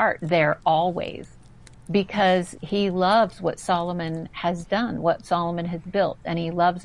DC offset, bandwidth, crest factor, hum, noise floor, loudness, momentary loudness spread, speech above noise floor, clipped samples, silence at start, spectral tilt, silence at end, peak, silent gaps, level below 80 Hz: 0.2%; 11.5 kHz; 16 dB; none; -48 dBFS; -24 LUFS; 8 LU; 25 dB; under 0.1%; 0 s; -6 dB/octave; 0 s; -8 dBFS; none; -52 dBFS